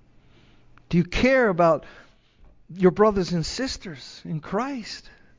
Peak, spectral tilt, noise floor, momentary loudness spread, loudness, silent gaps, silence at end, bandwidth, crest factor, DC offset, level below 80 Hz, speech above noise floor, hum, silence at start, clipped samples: -6 dBFS; -6 dB/octave; -54 dBFS; 18 LU; -23 LUFS; none; 0.4 s; 7.6 kHz; 18 dB; under 0.1%; -44 dBFS; 31 dB; none; 0.9 s; under 0.1%